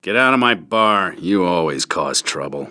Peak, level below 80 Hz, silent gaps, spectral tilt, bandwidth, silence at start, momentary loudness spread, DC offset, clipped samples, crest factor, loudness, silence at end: 0 dBFS; -58 dBFS; none; -3 dB/octave; 11 kHz; 0.05 s; 6 LU; under 0.1%; under 0.1%; 18 dB; -17 LUFS; 0 s